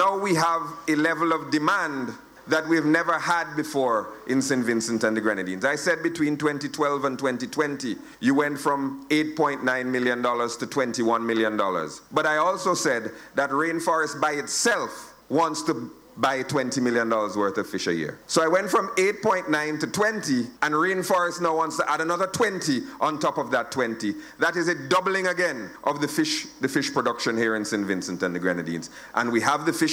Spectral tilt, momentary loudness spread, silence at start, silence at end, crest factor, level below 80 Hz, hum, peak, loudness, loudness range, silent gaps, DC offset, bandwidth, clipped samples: -4 dB/octave; 6 LU; 0 s; 0 s; 18 dB; -66 dBFS; none; -6 dBFS; -24 LUFS; 2 LU; none; under 0.1%; over 20 kHz; under 0.1%